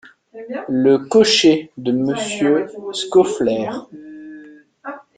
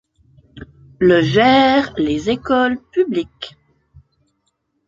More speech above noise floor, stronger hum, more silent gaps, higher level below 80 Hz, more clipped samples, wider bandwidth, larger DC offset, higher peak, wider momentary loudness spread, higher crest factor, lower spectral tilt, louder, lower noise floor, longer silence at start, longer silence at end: second, 25 dB vs 54 dB; neither; neither; second, -58 dBFS vs -46 dBFS; neither; first, 9.4 kHz vs 7.6 kHz; neither; about the same, -2 dBFS vs -2 dBFS; first, 23 LU vs 14 LU; about the same, 16 dB vs 16 dB; second, -4 dB/octave vs -6.5 dB/octave; about the same, -17 LUFS vs -15 LUFS; second, -42 dBFS vs -69 dBFS; second, 0.35 s vs 0.55 s; second, 0.15 s vs 1.4 s